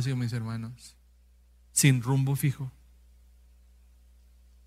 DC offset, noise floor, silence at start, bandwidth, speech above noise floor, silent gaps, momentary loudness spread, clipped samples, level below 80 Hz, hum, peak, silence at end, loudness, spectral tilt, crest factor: under 0.1%; -59 dBFS; 0 s; 16 kHz; 32 dB; none; 18 LU; under 0.1%; -58 dBFS; 60 Hz at -55 dBFS; -10 dBFS; 1.95 s; -27 LUFS; -4.5 dB/octave; 22 dB